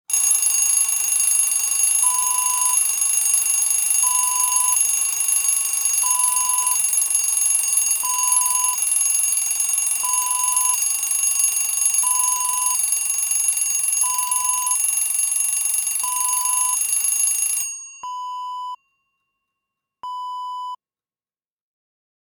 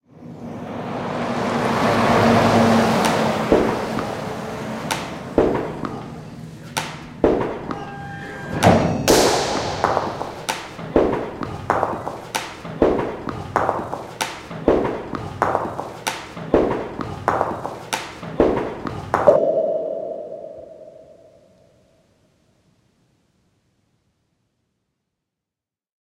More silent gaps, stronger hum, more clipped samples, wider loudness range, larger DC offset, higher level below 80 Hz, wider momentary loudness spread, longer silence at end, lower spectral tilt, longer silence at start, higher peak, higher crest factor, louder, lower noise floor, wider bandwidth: neither; neither; neither; first, 10 LU vs 7 LU; neither; second, -80 dBFS vs -42 dBFS; second, 12 LU vs 16 LU; second, 1.5 s vs 5.05 s; second, 5.5 dB/octave vs -5 dB/octave; about the same, 0.1 s vs 0.15 s; second, -4 dBFS vs 0 dBFS; second, 16 dB vs 22 dB; first, -16 LUFS vs -21 LUFS; about the same, under -90 dBFS vs -88 dBFS; first, over 20 kHz vs 16 kHz